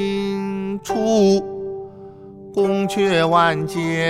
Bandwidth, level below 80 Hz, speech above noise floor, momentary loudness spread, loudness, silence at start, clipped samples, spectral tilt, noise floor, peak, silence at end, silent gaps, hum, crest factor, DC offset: 14.5 kHz; -54 dBFS; 22 dB; 19 LU; -19 LUFS; 0 s; under 0.1%; -5.5 dB/octave; -39 dBFS; -2 dBFS; 0 s; none; none; 16 dB; under 0.1%